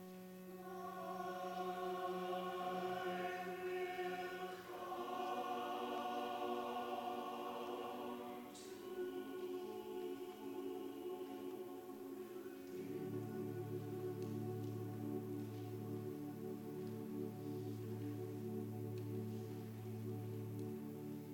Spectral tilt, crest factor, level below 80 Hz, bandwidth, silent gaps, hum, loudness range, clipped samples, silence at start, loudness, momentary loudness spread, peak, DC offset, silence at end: -6.5 dB/octave; 16 dB; -82 dBFS; 19.5 kHz; none; none; 4 LU; under 0.1%; 0 s; -47 LUFS; 7 LU; -30 dBFS; under 0.1%; 0 s